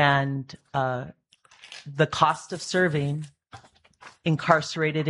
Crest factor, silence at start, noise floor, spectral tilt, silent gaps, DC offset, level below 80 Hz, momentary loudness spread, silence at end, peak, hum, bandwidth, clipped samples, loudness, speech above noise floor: 24 dB; 0 s; -54 dBFS; -5.5 dB/octave; none; under 0.1%; -62 dBFS; 18 LU; 0 s; -2 dBFS; none; 11.5 kHz; under 0.1%; -25 LUFS; 29 dB